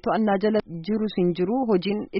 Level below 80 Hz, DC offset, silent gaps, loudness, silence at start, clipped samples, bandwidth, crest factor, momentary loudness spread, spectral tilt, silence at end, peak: -56 dBFS; under 0.1%; none; -24 LUFS; 0.05 s; under 0.1%; 5.8 kHz; 12 dB; 5 LU; -6 dB/octave; 0 s; -10 dBFS